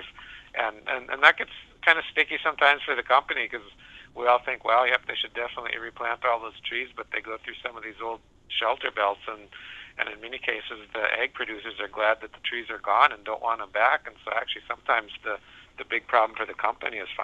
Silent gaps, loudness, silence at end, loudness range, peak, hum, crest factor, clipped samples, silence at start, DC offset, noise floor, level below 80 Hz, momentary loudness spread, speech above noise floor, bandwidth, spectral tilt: none; -26 LUFS; 0 s; 8 LU; 0 dBFS; none; 26 dB; under 0.1%; 0 s; under 0.1%; -46 dBFS; -62 dBFS; 15 LU; 19 dB; 9 kHz; -3 dB/octave